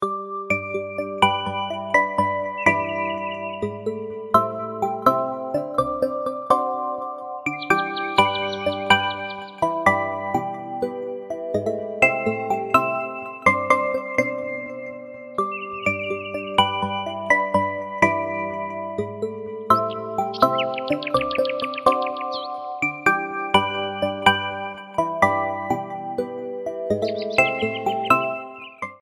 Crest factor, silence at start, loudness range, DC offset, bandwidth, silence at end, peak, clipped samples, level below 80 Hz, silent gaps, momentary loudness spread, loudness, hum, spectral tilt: 22 dB; 0 s; 2 LU; under 0.1%; 15.5 kHz; 0.05 s; 0 dBFS; under 0.1%; -56 dBFS; none; 10 LU; -23 LUFS; none; -4.5 dB/octave